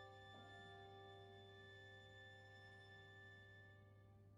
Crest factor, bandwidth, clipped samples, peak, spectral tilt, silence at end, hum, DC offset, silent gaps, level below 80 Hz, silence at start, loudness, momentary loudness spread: 14 dB; 10.5 kHz; under 0.1%; -50 dBFS; -5 dB/octave; 0 s; none; under 0.1%; none; -82 dBFS; 0 s; -62 LUFS; 5 LU